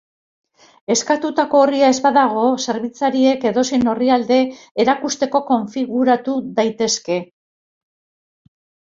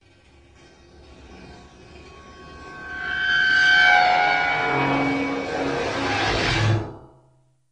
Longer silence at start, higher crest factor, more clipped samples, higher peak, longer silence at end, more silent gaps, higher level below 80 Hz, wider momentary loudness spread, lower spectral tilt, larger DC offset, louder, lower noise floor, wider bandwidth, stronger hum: second, 0.9 s vs 1.25 s; about the same, 16 dB vs 18 dB; neither; first, -2 dBFS vs -6 dBFS; first, 1.75 s vs 0.7 s; first, 4.71-4.75 s vs none; second, -60 dBFS vs -44 dBFS; second, 7 LU vs 18 LU; about the same, -3.5 dB/octave vs -4.5 dB/octave; neither; about the same, -17 LUFS vs -19 LUFS; first, under -90 dBFS vs -60 dBFS; second, 7.8 kHz vs 9.8 kHz; neither